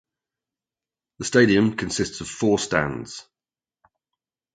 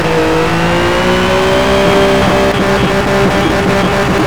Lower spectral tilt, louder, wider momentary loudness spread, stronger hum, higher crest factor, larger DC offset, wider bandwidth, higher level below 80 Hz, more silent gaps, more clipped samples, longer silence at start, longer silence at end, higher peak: about the same, -4.5 dB/octave vs -5.5 dB/octave; second, -22 LUFS vs -10 LUFS; first, 16 LU vs 2 LU; neither; first, 22 dB vs 10 dB; second, under 0.1% vs 4%; second, 9.4 kHz vs over 20 kHz; second, -52 dBFS vs -26 dBFS; neither; neither; first, 1.2 s vs 0 s; first, 1.35 s vs 0 s; about the same, -2 dBFS vs 0 dBFS